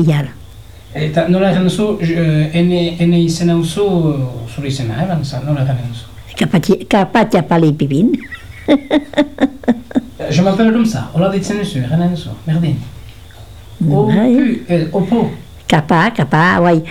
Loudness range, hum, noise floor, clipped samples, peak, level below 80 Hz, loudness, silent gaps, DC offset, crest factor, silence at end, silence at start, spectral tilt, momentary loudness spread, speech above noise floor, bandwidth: 3 LU; none; -36 dBFS; under 0.1%; 0 dBFS; -40 dBFS; -14 LUFS; none; 1%; 14 dB; 0 s; 0 s; -7 dB/octave; 10 LU; 22 dB; 13.5 kHz